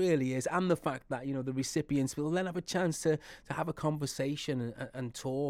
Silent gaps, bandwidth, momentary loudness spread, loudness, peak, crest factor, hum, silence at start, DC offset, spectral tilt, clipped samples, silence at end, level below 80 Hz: none; 16 kHz; 7 LU; -34 LUFS; -16 dBFS; 16 dB; none; 0 s; under 0.1%; -5.5 dB/octave; under 0.1%; 0 s; -62 dBFS